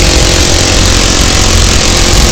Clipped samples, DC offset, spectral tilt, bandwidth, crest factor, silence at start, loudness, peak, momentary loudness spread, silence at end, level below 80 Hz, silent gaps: 3%; under 0.1%; -3 dB/octave; 17.5 kHz; 6 dB; 0 s; -6 LUFS; 0 dBFS; 0 LU; 0 s; -10 dBFS; none